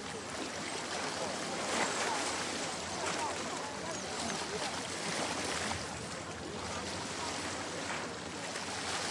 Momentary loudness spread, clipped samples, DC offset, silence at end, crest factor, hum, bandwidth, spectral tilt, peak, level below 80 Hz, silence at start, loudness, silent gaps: 6 LU; under 0.1%; under 0.1%; 0 s; 18 dB; none; 11.5 kHz; -2 dB/octave; -20 dBFS; -66 dBFS; 0 s; -37 LUFS; none